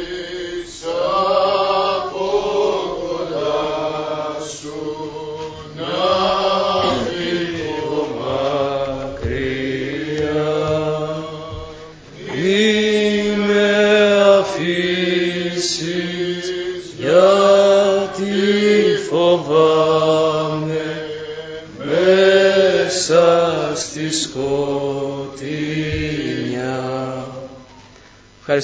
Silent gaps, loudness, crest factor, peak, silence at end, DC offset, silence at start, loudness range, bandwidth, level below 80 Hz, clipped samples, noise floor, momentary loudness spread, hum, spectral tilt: none; -17 LUFS; 18 dB; 0 dBFS; 0 s; under 0.1%; 0 s; 7 LU; 8 kHz; -44 dBFS; under 0.1%; -45 dBFS; 15 LU; none; -4.5 dB/octave